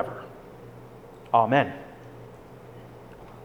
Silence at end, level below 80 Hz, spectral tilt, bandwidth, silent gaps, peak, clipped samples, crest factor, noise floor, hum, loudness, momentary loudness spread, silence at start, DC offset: 0 s; -58 dBFS; -7.5 dB/octave; 19.5 kHz; none; -6 dBFS; under 0.1%; 24 dB; -46 dBFS; none; -24 LUFS; 24 LU; 0 s; under 0.1%